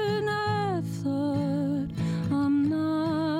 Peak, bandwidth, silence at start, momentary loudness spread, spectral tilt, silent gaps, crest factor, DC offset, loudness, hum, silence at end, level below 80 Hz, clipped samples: -14 dBFS; 14.5 kHz; 0 s; 5 LU; -7.5 dB/octave; none; 12 dB; under 0.1%; -27 LUFS; none; 0 s; -56 dBFS; under 0.1%